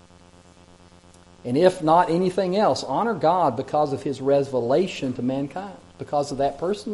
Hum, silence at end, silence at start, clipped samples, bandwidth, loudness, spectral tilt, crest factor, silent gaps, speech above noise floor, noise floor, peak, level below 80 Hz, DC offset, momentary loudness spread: none; 0 s; 1.45 s; under 0.1%; 11.5 kHz; -22 LUFS; -6.5 dB/octave; 20 dB; none; 29 dB; -51 dBFS; -4 dBFS; -58 dBFS; under 0.1%; 9 LU